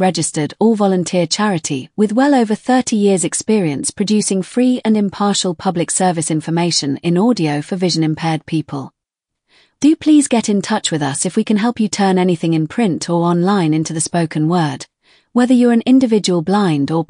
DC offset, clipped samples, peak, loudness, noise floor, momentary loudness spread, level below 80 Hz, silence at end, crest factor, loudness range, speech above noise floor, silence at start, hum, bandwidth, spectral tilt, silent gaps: under 0.1%; under 0.1%; -2 dBFS; -15 LUFS; -80 dBFS; 7 LU; -60 dBFS; 0.05 s; 12 dB; 2 LU; 65 dB; 0 s; none; 10.5 kHz; -5 dB/octave; none